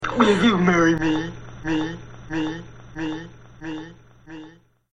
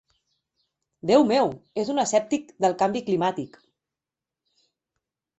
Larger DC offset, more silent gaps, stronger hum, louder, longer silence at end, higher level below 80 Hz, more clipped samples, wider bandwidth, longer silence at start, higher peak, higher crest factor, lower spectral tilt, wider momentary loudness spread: first, 0.4% vs under 0.1%; neither; neither; about the same, -22 LUFS vs -23 LUFS; second, 0.35 s vs 1.9 s; first, -46 dBFS vs -68 dBFS; neither; first, 10 kHz vs 8.2 kHz; second, 0 s vs 1.05 s; first, -2 dBFS vs -6 dBFS; about the same, 22 dB vs 20 dB; about the same, -6 dB/octave vs -5 dB/octave; first, 24 LU vs 12 LU